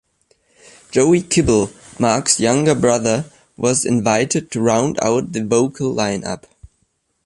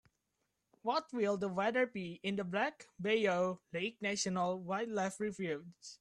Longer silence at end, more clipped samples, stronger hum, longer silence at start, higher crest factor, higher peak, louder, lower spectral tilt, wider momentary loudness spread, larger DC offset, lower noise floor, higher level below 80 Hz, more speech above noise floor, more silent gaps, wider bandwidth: first, 0.6 s vs 0.05 s; neither; neither; about the same, 0.9 s vs 0.85 s; about the same, 18 dB vs 18 dB; first, 0 dBFS vs -20 dBFS; first, -17 LUFS vs -37 LUFS; about the same, -4.5 dB/octave vs -4.5 dB/octave; about the same, 7 LU vs 8 LU; neither; second, -66 dBFS vs -84 dBFS; first, -44 dBFS vs -78 dBFS; about the same, 50 dB vs 48 dB; neither; about the same, 11.5 kHz vs 11.5 kHz